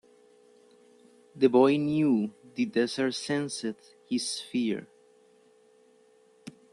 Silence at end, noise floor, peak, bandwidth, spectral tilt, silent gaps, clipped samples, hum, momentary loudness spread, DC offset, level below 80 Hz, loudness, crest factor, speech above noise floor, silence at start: 0.2 s; -61 dBFS; -10 dBFS; 12 kHz; -5 dB/octave; none; under 0.1%; none; 16 LU; under 0.1%; -74 dBFS; -28 LUFS; 20 dB; 35 dB; 1.35 s